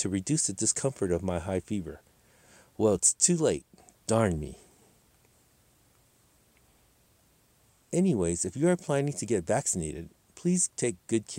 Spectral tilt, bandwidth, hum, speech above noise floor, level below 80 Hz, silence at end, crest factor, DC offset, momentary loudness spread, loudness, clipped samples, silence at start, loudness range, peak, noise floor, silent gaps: -4.5 dB/octave; 16 kHz; none; 37 dB; -58 dBFS; 0 s; 22 dB; under 0.1%; 13 LU; -28 LUFS; under 0.1%; 0 s; 8 LU; -8 dBFS; -65 dBFS; none